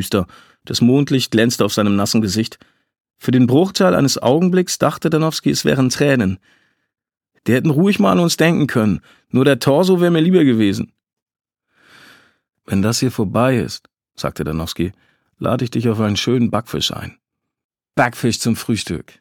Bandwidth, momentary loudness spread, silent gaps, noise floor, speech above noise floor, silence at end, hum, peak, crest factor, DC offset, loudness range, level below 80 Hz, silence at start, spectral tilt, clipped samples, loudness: 18.5 kHz; 11 LU; 3.00-3.04 s, 11.22-11.26 s, 17.64-17.69 s; -56 dBFS; 40 dB; 0.2 s; none; 0 dBFS; 16 dB; under 0.1%; 6 LU; -48 dBFS; 0 s; -5.5 dB/octave; under 0.1%; -16 LUFS